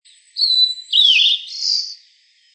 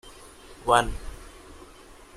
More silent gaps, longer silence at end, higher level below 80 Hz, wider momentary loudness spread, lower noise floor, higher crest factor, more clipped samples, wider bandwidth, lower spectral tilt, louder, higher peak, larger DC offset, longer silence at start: neither; first, 0.6 s vs 0.25 s; second, under -90 dBFS vs -42 dBFS; second, 12 LU vs 25 LU; first, -55 dBFS vs -49 dBFS; second, 16 dB vs 26 dB; neither; second, 8.8 kHz vs 15 kHz; second, 14.5 dB/octave vs -3.5 dB/octave; first, -13 LUFS vs -24 LUFS; about the same, -2 dBFS vs -2 dBFS; neither; first, 0.35 s vs 0.05 s